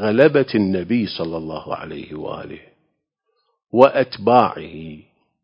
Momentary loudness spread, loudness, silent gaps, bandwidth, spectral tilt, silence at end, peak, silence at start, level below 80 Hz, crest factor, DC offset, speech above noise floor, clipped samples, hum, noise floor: 19 LU; -18 LUFS; none; 6.2 kHz; -8.5 dB/octave; 0.4 s; 0 dBFS; 0 s; -52 dBFS; 20 dB; under 0.1%; 54 dB; under 0.1%; none; -73 dBFS